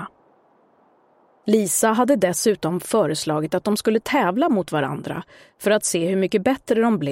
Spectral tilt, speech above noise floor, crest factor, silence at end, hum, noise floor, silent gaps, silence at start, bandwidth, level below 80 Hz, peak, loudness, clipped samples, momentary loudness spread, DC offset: -4.5 dB/octave; 38 dB; 18 dB; 0 s; none; -58 dBFS; none; 0 s; 16.5 kHz; -60 dBFS; -4 dBFS; -20 LUFS; under 0.1%; 8 LU; under 0.1%